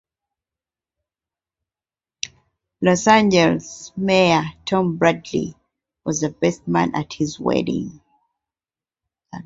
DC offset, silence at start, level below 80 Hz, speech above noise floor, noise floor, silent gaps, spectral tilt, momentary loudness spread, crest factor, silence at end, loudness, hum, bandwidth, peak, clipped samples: under 0.1%; 2.25 s; -54 dBFS; over 71 dB; under -90 dBFS; none; -5 dB/octave; 17 LU; 20 dB; 0.05 s; -19 LUFS; none; 8 kHz; -2 dBFS; under 0.1%